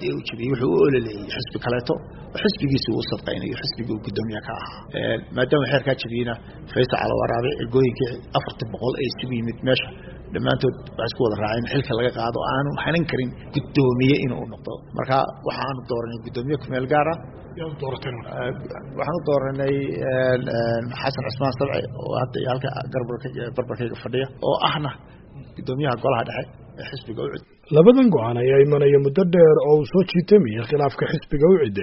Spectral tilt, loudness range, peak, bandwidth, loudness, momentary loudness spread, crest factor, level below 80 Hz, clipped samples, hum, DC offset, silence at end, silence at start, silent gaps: -5.5 dB/octave; 9 LU; 0 dBFS; 6 kHz; -22 LUFS; 14 LU; 22 dB; -46 dBFS; under 0.1%; none; under 0.1%; 0 s; 0 s; none